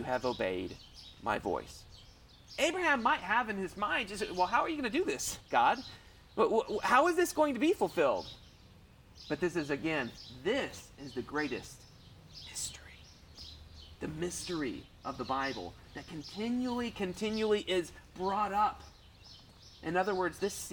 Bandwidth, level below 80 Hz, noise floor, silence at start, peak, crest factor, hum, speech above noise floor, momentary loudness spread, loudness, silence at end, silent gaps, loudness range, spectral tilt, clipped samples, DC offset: 19 kHz; -58 dBFS; -58 dBFS; 0 s; -12 dBFS; 22 dB; none; 25 dB; 21 LU; -33 LUFS; 0 s; none; 10 LU; -4 dB/octave; under 0.1%; under 0.1%